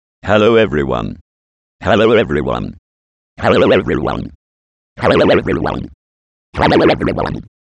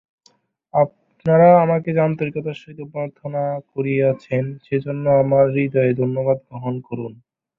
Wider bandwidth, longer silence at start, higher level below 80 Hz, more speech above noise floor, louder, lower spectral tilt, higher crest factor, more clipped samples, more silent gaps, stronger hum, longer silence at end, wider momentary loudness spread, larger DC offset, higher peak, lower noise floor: first, 9.6 kHz vs 5.6 kHz; second, 0.25 s vs 0.75 s; first, -36 dBFS vs -60 dBFS; first, over 77 dB vs 41 dB; first, -14 LUFS vs -19 LUFS; second, -7 dB/octave vs -10.5 dB/octave; about the same, 14 dB vs 18 dB; neither; first, 1.21-1.79 s, 2.79-3.36 s, 4.35-4.96 s, 5.94-6.53 s vs none; neither; about the same, 0.35 s vs 0.45 s; about the same, 15 LU vs 15 LU; neither; about the same, 0 dBFS vs -2 dBFS; first, under -90 dBFS vs -59 dBFS